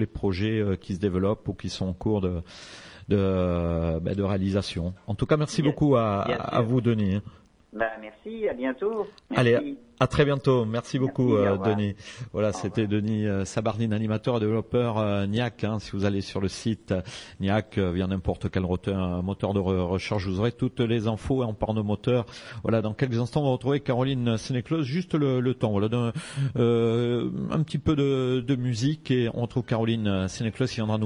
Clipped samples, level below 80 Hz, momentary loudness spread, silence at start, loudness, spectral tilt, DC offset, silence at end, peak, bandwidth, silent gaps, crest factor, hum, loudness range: under 0.1%; -48 dBFS; 8 LU; 0 s; -26 LUFS; -7 dB/octave; under 0.1%; 0 s; -6 dBFS; 11 kHz; none; 20 dB; none; 3 LU